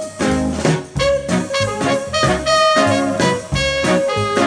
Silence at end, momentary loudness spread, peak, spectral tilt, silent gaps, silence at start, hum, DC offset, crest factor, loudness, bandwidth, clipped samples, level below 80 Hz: 0 s; 6 LU; -2 dBFS; -4.5 dB/octave; none; 0 s; none; under 0.1%; 14 dB; -16 LUFS; 10.5 kHz; under 0.1%; -36 dBFS